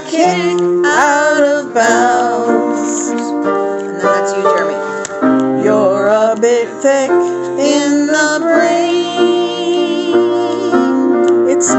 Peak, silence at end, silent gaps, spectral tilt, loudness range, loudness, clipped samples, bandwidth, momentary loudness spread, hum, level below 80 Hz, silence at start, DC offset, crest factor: 0 dBFS; 0 s; none; -3.5 dB/octave; 2 LU; -13 LUFS; under 0.1%; 8.4 kHz; 5 LU; none; -62 dBFS; 0 s; under 0.1%; 12 dB